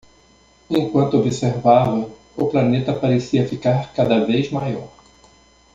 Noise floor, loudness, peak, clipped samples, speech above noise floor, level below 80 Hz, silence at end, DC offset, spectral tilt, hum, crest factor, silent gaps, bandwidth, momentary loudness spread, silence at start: -53 dBFS; -19 LUFS; -2 dBFS; under 0.1%; 35 dB; -52 dBFS; 0.85 s; under 0.1%; -7.5 dB/octave; none; 18 dB; none; 7.8 kHz; 9 LU; 0.7 s